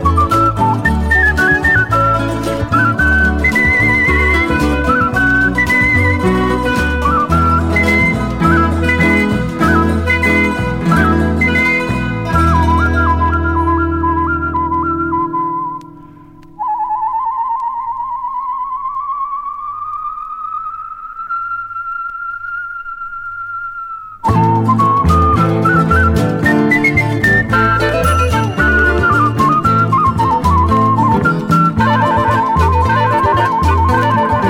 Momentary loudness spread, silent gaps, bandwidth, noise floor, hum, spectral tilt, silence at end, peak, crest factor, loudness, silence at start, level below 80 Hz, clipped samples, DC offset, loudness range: 11 LU; none; 16 kHz; -38 dBFS; none; -6.5 dB/octave; 0 s; 0 dBFS; 12 dB; -13 LUFS; 0 s; -26 dBFS; under 0.1%; under 0.1%; 10 LU